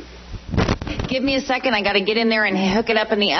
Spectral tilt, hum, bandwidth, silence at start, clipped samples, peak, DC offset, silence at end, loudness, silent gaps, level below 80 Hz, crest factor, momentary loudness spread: -5 dB/octave; none; 6.4 kHz; 0 s; under 0.1%; -4 dBFS; under 0.1%; 0 s; -19 LUFS; none; -36 dBFS; 16 dB; 7 LU